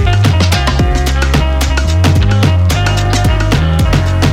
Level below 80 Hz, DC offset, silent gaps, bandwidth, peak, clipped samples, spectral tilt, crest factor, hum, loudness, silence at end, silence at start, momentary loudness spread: -14 dBFS; under 0.1%; none; 16 kHz; 0 dBFS; under 0.1%; -5.5 dB/octave; 10 dB; none; -11 LUFS; 0 s; 0 s; 3 LU